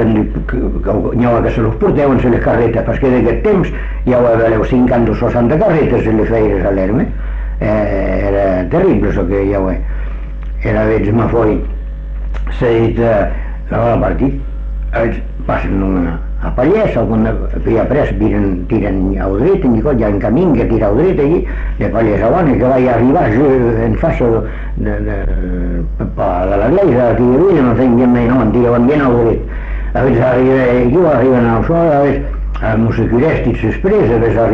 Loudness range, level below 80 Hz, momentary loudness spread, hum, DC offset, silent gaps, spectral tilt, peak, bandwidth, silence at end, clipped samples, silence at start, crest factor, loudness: 4 LU; -20 dBFS; 9 LU; none; under 0.1%; none; -10 dB/octave; -2 dBFS; 6 kHz; 0 s; under 0.1%; 0 s; 10 dB; -13 LUFS